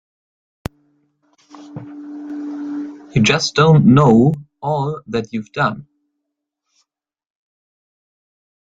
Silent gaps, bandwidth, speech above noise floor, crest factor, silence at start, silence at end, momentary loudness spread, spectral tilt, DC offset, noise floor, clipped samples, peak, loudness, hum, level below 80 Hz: none; 7.8 kHz; 64 dB; 18 dB; 1.55 s; 2.9 s; 23 LU; -6 dB/octave; under 0.1%; -78 dBFS; under 0.1%; 0 dBFS; -16 LUFS; none; -50 dBFS